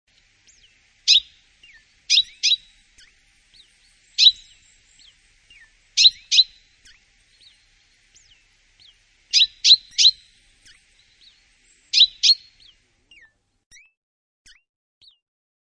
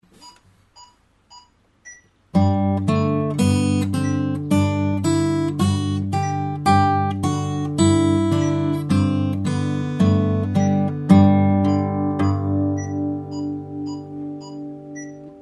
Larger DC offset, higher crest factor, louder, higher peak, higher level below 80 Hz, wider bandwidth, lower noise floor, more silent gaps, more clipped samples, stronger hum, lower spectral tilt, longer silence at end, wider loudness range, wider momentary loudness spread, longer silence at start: neither; about the same, 22 dB vs 18 dB; first, -15 LUFS vs -20 LUFS; about the same, -2 dBFS vs -2 dBFS; second, -64 dBFS vs -54 dBFS; second, 10 kHz vs 12 kHz; first, -59 dBFS vs -53 dBFS; neither; neither; neither; second, 6 dB/octave vs -7 dB/octave; first, 3.4 s vs 0 s; about the same, 5 LU vs 6 LU; second, 10 LU vs 13 LU; first, 1.05 s vs 0.25 s